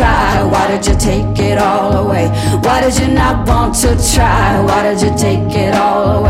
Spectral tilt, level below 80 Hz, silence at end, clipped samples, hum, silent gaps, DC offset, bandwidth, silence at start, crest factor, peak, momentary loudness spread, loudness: -5 dB/octave; -20 dBFS; 0 s; under 0.1%; none; none; under 0.1%; 16.5 kHz; 0 s; 10 dB; 0 dBFS; 3 LU; -12 LUFS